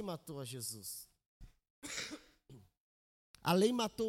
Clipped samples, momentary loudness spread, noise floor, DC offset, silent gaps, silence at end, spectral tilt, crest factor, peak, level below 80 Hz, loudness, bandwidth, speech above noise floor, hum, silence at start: under 0.1%; 20 LU; -61 dBFS; under 0.1%; 1.26-1.40 s, 1.70-1.82 s, 2.77-3.34 s; 0 s; -4.5 dB/octave; 22 dB; -18 dBFS; -68 dBFS; -38 LUFS; 16.5 kHz; 24 dB; none; 0 s